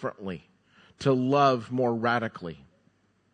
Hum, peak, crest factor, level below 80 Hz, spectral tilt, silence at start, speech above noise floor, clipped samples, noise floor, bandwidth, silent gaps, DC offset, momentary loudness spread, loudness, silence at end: none; -10 dBFS; 18 dB; -66 dBFS; -7 dB/octave; 0 s; 40 dB; under 0.1%; -67 dBFS; 9.4 kHz; none; under 0.1%; 18 LU; -26 LUFS; 0.8 s